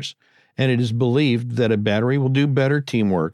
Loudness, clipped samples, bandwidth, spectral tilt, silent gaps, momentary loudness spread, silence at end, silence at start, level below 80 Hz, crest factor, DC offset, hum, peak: -20 LUFS; under 0.1%; 10.5 kHz; -7.5 dB/octave; none; 3 LU; 0 s; 0 s; -62 dBFS; 14 dB; under 0.1%; none; -6 dBFS